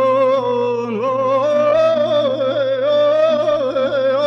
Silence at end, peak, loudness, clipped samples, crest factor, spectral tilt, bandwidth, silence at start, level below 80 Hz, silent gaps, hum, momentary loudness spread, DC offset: 0 s; -6 dBFS; -16 LUFS; under 0.1%; 10 dB; -6 dB/octave; 7 kHz; 0 s; -60 dBFS; none; none; 4 LU; under 0.1%